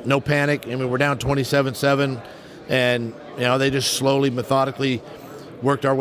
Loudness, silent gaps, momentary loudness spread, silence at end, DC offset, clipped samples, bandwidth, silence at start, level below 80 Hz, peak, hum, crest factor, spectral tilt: -21 LUFS; none; 13 LU; 0 s; under 0.1%; under 0.1%; 16 kHz; 0 s; -50 dBFS; -6 dBFS; none; 16 dB; -5 dB/octave